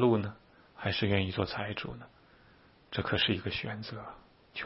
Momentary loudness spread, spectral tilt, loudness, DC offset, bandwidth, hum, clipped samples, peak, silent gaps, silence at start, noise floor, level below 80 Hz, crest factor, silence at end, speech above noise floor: 15 LU; -9.5 dB/octave; -33 LUFS; under 0.1%; 5.8 kHz; none; under 0.1%; -14 dBFS; none; 0 s; -61 dBFS; -58 dBFS; 20 dB; 0 s; 29 dB